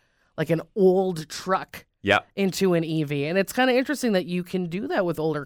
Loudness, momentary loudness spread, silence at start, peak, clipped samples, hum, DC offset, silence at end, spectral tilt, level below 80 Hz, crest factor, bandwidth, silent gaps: -24 LUFS; 8 LU; 0.35 s; -6 dBFS; under 0.1%; none; under 0.1%; 0 s; -5.5 dB/octave; -62 dBFS; 18 dB; 19 kHz; none